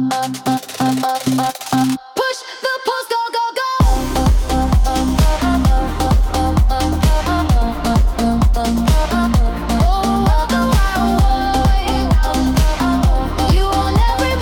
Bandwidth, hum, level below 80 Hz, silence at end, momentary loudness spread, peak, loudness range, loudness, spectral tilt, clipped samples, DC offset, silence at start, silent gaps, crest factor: 18 kHz; none; -18 dBFS; 0 s; 4 LU; -4 dBFS; 3 LU; -16 LUFS; -5.5 dB/octave; under 0.1%; under 0.1%; 0 s; none; 10 dB